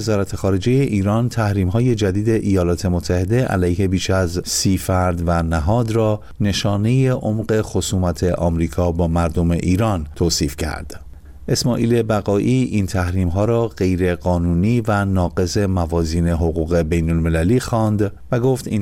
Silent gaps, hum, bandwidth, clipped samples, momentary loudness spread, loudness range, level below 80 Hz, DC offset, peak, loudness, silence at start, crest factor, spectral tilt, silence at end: none; none; 16 kHz; under 0.1%; 3 LU; 1 LU; -32 dBFS; under 0.1%; -8 dBFS; -18 LUFS; 0 s; 10 dB; -6 dB/octave; 0 s